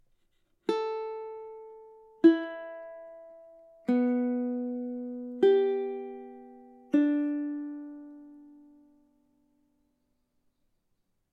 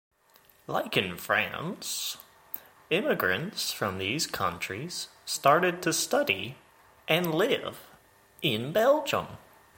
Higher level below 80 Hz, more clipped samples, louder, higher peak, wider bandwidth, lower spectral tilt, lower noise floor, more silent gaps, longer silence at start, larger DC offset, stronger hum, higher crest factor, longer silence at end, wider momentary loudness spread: second, -78 dBFS vs -66 dBFS; neither; about the same, -29 LUFS vs -28 LUFS; about the same, -10 dBFS vs -8 dBFS; second, 7 kHz vs 17 kHz; first, -7 dB/octave vs -3.5 dB/octave; first, -76 dBFS vs -61 dBFS; neither; about the same, 0.7 s vs 0.7 s; neither; neither; about the same, 22 dB vs 22 dB; first, 2.8 s vs 0.4 s; first, 24 LU vs 16 LU